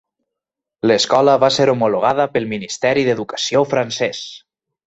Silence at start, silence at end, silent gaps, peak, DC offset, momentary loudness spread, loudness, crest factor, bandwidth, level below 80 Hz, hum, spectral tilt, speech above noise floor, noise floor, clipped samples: 0.85 s; 0.5 s; none; -2 dBFS; under 0.1%; 9 LU; -16 LUFS; 16 dB; 8.2 kHz; -58 dBFS; none; -4 dB/octave; 68 dB; -84 dBFS; under 0.1%